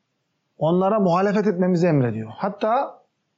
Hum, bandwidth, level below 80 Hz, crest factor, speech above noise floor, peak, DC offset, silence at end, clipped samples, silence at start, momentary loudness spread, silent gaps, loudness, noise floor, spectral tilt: none; 7.6 kHz; -70 dBFS; 12 dB; 53 dB; -10 dBFS; under 0.1%; 0.45 s; under 0.1%; 0.6 s; 8 LU; none; -21 LUFS; -73 dBFS; -7.5 dB/octave